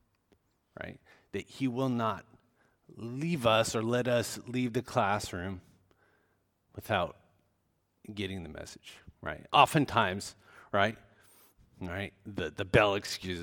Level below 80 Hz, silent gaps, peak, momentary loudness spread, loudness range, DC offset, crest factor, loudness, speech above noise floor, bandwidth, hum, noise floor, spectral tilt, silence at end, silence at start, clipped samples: -60 dBFS; none; -8 dBFS; 20 LU; 9 LU; under 0.1%; 24 dB; -31 LUFS; 45 dB; 19 kHz; none; -76 dBFS; -5 dB/octave; 0 s; 0.8 s; under 0.1%